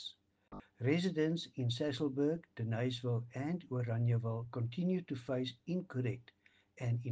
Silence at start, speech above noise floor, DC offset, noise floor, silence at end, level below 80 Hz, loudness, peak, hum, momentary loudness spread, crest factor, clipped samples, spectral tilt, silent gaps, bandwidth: 0 s; 20 dB; under 0.1%; -56 dBFS; 0 s; -74 dBFS; -38 LUFS; -20 dBFS; none; 7 LU; 18 dB; under 0.1%; -7.5 dB/octave; none; 8 kHz